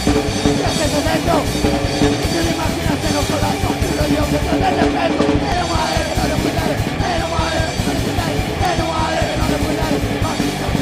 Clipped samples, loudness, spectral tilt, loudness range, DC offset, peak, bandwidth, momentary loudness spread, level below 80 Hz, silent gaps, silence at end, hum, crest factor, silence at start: under 0.1%; -17 LUFS; -5 dB/octave; 1 LU; under 0.1%; -2 dBFS; 15.5 kHz; 3 LU; -28 dBFS; none; 0 s; none; 16 dB; 0 s